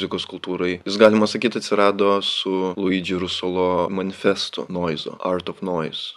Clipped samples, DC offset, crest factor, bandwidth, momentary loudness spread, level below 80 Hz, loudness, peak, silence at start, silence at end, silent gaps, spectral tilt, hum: under 0.1%; under 0.1%; 22 dB; 11.5 kHz; 10 LU; -66 dBFS; -21 LUFS; 0 dBFS; 0 s; 0.05 s; none; -5 dB/octave; none